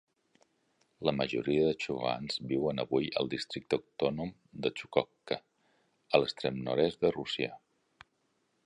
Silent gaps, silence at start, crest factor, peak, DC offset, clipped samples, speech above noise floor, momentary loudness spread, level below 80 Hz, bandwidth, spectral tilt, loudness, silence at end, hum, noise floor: none; 1 s; 26 dB; -8 dBFS; under 0.1%; under 0.1%; 44 dB; 8 LU; -64 dBFS; 10.5 kHz; -6 dB/octave; -33 LUFS; 1.1 s; none; -76 dBFS